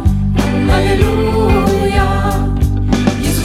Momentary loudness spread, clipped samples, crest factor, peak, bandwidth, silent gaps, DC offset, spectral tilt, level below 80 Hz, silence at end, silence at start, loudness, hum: 3 LU; under 0.1%; 12 dB; 0 dBFS; 15.5 kHz; none; under 0.1%; -6.5 dB/octave; -18 dBFS; 0 s; 0 s; -14 LUFS; none